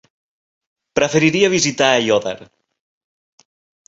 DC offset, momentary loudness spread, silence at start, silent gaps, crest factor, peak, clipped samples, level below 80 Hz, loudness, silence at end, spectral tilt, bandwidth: under 0.1%; 11 LU; 0.95 s; none; 18 dB; -2 dBFS; under 0.1%; -56 dBFS; -16 LUFS; 1.45 s; -3.5 dB/octave; 8 kHz